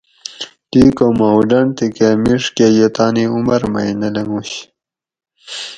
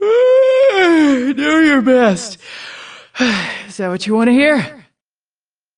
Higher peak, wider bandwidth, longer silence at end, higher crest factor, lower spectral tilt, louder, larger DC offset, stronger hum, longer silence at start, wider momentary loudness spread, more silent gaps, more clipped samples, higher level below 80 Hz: about the same, 0 dBFS vs 0 dBFS; second, 9.4 kHz vs 10.5 kHz; second, 0 s vs 1.05 s; about the same, 14 dB vs 14 dB; about the same, -6 dB/octave vs -5 dB/octave; about the same, -14 LUFS vs -13 LUFS; neither; neither; first, 0.3 s vs 0 s; second, 16 LU vs 19 LU; neither; neither; first, -44 dBFS vs -54 dBFS